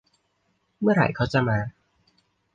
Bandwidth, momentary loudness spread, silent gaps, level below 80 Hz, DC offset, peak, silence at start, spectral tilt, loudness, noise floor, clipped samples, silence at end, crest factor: 8.6 kHz; 7 LU; none; -52 dBFS; under 0.1%; -6 dBFS; 0.8 s; -8 dB/octave; -23 LUFS; -71 dBFS; under 0.1%; 0.85 s; 20 dB